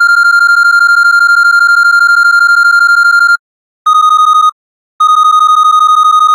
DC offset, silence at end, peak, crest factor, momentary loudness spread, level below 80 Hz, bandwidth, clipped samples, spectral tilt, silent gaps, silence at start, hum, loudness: under 0.1%; 0 s; 0 dBFS; 6 dB; 4 LU; under -90 dBFS; 16.5 kHz; under 0.1%; 7.5 dB/octave; 3.39-3.85 s, 4.52-4.99 s; 0 s; none; -5 LUFS